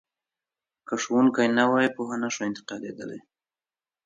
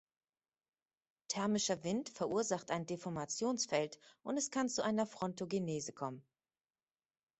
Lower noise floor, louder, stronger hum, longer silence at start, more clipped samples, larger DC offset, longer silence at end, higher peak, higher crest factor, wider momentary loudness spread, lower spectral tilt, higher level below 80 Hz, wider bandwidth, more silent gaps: about the same, under -90 dBFS vs under -90 dBFS; first, -25 LUFS vs -38 LUFS; neither; second, 0.9 s vs 1.3 s; neither; neither; second, 0.9 s vs 1.2 s; first, -8 dBFS vs -20 dBFS; about the same, 18 dB vs 20 dB; first, 17 LU vs 8 LU; about the same, -4.5 dB/octave vs -4 dB/octave; about the same, -74 dBFS vs -76 dBFS; about the same, 7.8 kHz vs 8.4 kHz; neither